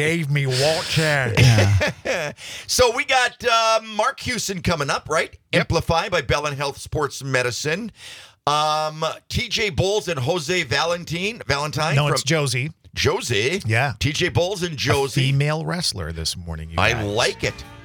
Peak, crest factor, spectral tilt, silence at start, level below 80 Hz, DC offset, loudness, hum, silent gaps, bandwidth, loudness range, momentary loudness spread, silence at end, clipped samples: -4 dBFS; 18 dB; -4 dB/octave; 0 s; -44 dBFS; under 0.1%; -21 LUFS; none; none; 19.5 kHz; 4 LU; 8 LU; 0 s; under 0.1%